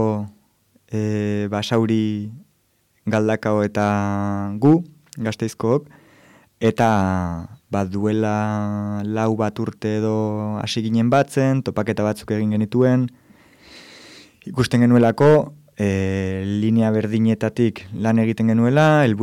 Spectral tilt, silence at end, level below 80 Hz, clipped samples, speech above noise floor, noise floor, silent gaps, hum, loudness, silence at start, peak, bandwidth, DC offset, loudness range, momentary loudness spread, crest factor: -7.5 dB/octave; 0 s; -54 dBFS; under 0.1%; 45 dB; -64 dBFS; none; none; -20 LUFS; 0 s; -6 dBFS; 13.5 kHz; under 0.1%; 4 LU; 10 LU; 14 dB